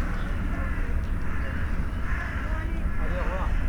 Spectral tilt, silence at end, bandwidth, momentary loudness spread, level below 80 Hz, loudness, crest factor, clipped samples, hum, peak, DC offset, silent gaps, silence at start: -7.5 dB/octave; 0 s; 11 kHz; 2 LU; -28 dBFS; -31 LUFS; 10 dB; under 0.1%; none; -16 dBFS; under 0.1%; none; 0 s